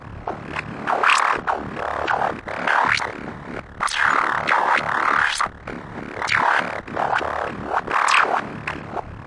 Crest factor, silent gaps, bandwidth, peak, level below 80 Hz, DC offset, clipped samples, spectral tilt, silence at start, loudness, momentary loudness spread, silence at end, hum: 18 dB; none; 11.5 kHz; -4 dBFS; -48 dBFS; under 0.1%; under 0.1%; -3 dB/octave; 0 s; -21 LUFS; 15 LU; 0 s; none